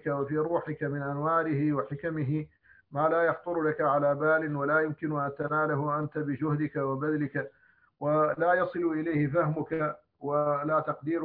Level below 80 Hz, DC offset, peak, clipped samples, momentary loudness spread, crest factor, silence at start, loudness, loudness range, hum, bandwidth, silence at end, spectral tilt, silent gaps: -66 dBFS; under 0.1%; -14 dBFS; under 0.1%; 7 LU; 16 dB; 0.05 s; -29 LUFS; 2 LU; none; 4.5 kHz; 0 s; -12 dB/octave; none